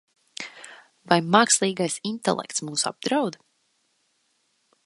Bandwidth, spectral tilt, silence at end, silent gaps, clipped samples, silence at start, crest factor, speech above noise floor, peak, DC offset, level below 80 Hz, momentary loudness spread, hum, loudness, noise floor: 11.5 kHz; -3 dB/octave; 1.55 s; none; under 0.1%; 0.4 s; 26 dB; 47 dB; 0 dBFS; under 0.1%; -74 dBFS; 19 LU; none; -23 LUFS; -70 dBFS